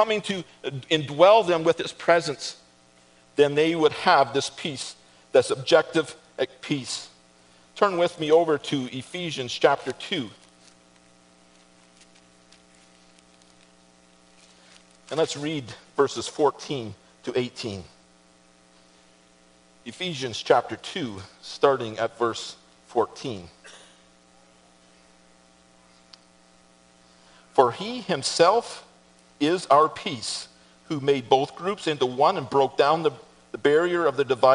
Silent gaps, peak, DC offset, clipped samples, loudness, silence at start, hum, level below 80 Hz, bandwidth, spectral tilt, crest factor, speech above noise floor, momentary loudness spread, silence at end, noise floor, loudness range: none; -2 dBFS; under 0.1%; under 0.1%; -24 LUFS; 0 s; none; -68 dBFS; 10.5 kHz; -4 dB/octave; 24 dB; 34 dB; 15 LU; 0 s; -57 dBFS; 12 LU